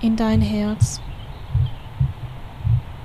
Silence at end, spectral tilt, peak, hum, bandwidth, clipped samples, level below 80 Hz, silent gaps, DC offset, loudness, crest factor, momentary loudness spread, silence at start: 0 s; -6.5 dB/octave; -6 dBFS; none; 13 kHz; under 0.1%; -32 dBFS; none; 0.5%; -22 LUFS; 16 dB; 16 LU; 0 s